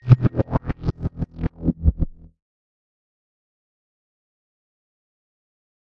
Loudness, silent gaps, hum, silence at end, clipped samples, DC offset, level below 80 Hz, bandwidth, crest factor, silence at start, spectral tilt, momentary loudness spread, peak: -24 LUFS; none; none; 3.85 s; under 0.1%; under 0.1%; -34 dBFS; 5.6 kHz; 24 dB; 0.05 s; -11 dB/octave; 12 LU; 0 dBFS